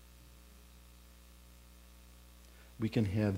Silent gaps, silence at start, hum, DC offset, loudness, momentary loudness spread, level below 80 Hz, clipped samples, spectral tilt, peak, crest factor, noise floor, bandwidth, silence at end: none; 1.95 s; 60 Hz at -60 dBFS; under 0.1%; -35 LUFS; 25 LU; -58 dBFS; under 0.1%; -7.5 dB/octave; -20 dBFS; 20 dB; -58 dBFS; 16 kHz; 0 s